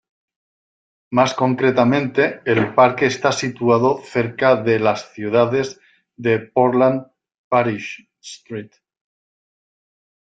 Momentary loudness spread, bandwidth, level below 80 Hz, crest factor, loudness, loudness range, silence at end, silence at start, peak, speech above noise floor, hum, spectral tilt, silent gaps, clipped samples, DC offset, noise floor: 15 LU; 9 kHz; -60 dBFS; 18 dB; -18 LUFS; 5 LU; 1.6 s; 1.1 s; -2 dBFS; over 72 dB; none; -6 dB/octave; 7.38-7.51 s; under 0.1%; under 0.1%; under -90 dBFS